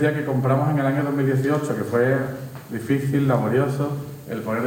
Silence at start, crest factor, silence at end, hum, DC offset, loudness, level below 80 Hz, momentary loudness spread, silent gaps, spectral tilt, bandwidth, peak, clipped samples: 0 s; 14 dB; 0 s; none; under 0.1%; -22 LUFS; -60 dBFS; 11 LU; none; -8 dB/octave; 17 kHz; -8 dBFS; under 0.1%